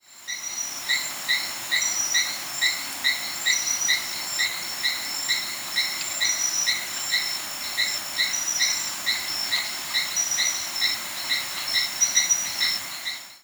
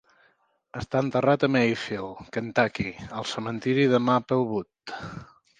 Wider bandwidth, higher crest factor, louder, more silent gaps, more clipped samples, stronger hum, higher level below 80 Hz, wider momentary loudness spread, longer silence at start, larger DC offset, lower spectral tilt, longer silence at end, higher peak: first, over 20 kHz vs 9.4 kHz; about the same, 20 dB vs 20 dB; about the same, -23 LUFS vs -25 LUFS; neither; neither; neither; second, -68 dBFS vs -56 dBFS; second, 6 LU vs 16 LU; second, 0.1 s vs 0.75 s; neither; second, 2.5 dB/octave vs -6.5 dB/octave; second, 0.05 s vs 0.35 s; about the same, -6 dBFS vs -6 dBFS